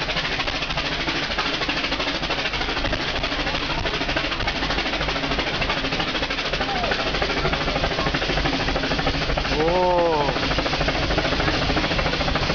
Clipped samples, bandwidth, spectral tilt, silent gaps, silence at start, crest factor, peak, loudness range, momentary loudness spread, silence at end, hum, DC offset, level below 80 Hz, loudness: under 0.1%; 7.2 kHz; -4.5 dB/octave; none; 0 s; 14 dB; -8 dBFS; 2 LU; 3 LU; 0 s; none; 0.5%; -32 dBFS; -22 LUFS